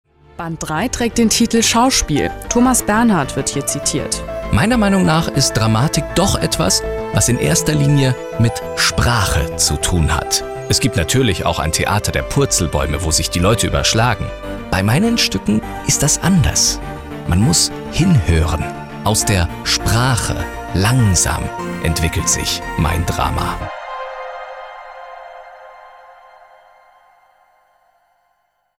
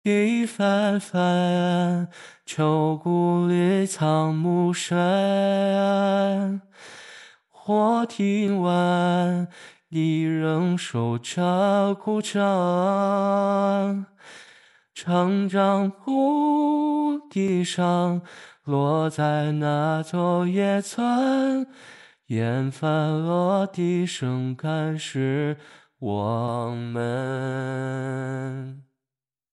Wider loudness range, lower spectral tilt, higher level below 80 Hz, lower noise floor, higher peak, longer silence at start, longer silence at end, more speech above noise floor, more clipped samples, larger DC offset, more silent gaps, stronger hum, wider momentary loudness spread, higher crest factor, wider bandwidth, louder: about the same, 5 LU vs 5 LU; second, -4 dB/octave vs -6.5 dB/octave; first, -28 dBFS vs -78 dBFS; second, -64 dBFS vs under -90 dBFS; first, -2 dBFS vs -10 dBFS; first, 0.4 s vs 0.05 s; first, 2.7 s vs 0.7 s; second, 49 dB vs over 67 dB; neither; neither; neither; first, 50 Hz at -40 dBFS vs none; first, 12 LU vs 9 LU; about the same, 14 dB vs 14 dB; first, 17 kHz vs 12 kHz; first, -16 LUFS vs -23 LUFS